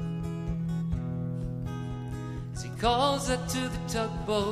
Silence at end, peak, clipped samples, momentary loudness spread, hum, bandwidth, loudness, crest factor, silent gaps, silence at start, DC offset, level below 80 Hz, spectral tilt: 0 s; -10 dBFS; under 0.1%; 11 LU; none; 15 kHz; -31 LUFS; 20 dB; none; 0 s; under 0.1%; -42 dBFS; -5.5 dB/octave